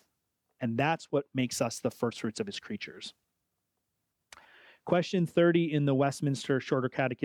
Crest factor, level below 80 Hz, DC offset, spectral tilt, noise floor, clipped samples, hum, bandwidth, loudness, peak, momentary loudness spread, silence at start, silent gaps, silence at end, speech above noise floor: 18 dB; -72 dBFS; under 0.1%; -6 dB/octave; -83 dBFS; under 0.1%; none; 17 kHz; -30 LUFS; -14 dBFS; 13 LU; 0.6 s; none; 0 s; 53 dB